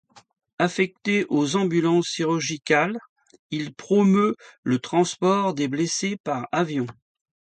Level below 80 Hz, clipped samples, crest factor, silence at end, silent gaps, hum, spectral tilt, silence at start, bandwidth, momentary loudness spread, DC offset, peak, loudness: -68 dBFS; under 0.1%; 20 dB; 0.65 s; 3.09-3.16 s, 3.39-3.50 s, 4.58-4.63 s, 6.20-6.24 s; none; -5 dB/octave; 0.6 s; 9.2 kHz; 10 LU; under 0.1%; -4 dBFS; -23 LUFS